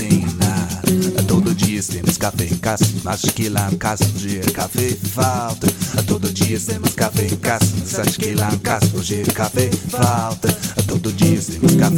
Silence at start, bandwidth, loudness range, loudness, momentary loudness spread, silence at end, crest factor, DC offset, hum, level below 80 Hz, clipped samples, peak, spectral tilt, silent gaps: 0 s; 17.5 kHz; 1 LU; -18 LUFS; 4 LU; 0 s; 16 dB; under 0.1%; none; -42 dBFS; under 0.1%; -2 dBFS; -5 dB/octave; none